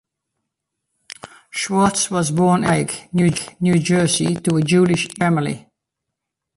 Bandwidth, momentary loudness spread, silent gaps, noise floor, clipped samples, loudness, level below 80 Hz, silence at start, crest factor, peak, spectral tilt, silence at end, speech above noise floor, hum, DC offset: 11.5 kHz; 12 LU; none; -81 dBFS; under 0.1%; -18 LUFS; -52 dBFS; 1.25 s; 16 dB; -4 dBFS; -5 dB/octave; 0.95 s; 63 dB; none; under 0.1%